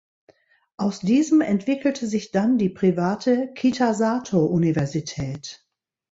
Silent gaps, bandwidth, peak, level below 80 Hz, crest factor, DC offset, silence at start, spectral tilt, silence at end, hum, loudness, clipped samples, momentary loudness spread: none; 8 kHz; -8 dBFS; -58 dBFS; 16 dB; under 0.1%; 0.8 s; -6.5 dB/octave; 0.55 s; none; -22 LUFS; under 0.1%; 9 LU